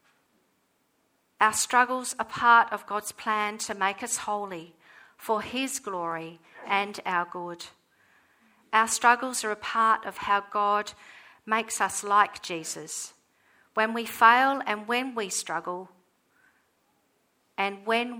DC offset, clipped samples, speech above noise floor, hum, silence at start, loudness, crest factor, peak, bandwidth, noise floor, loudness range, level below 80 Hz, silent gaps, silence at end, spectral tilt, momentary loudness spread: under 0.1%; under 0.1%; 44 dB; none; 1.4 s; -26 LUFS; 24 dB; -4 dBFS; over 20 kHz; -71 dBFS; 6 LU; -72 dBFS; none; 0 s; -1.5 dB/octave; 16 LU